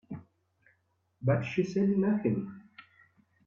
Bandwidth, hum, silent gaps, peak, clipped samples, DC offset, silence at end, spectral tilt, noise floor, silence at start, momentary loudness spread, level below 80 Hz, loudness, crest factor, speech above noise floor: 7 kHz; none; none; -14 dBFS; under 0.1%; under 0.1%; 0.65 s; -8.5 dB/octave; -74 dBFS; 0.1 s; 19 LU; -70 dBFS; -30 LUFS; 18 dB; 46 dB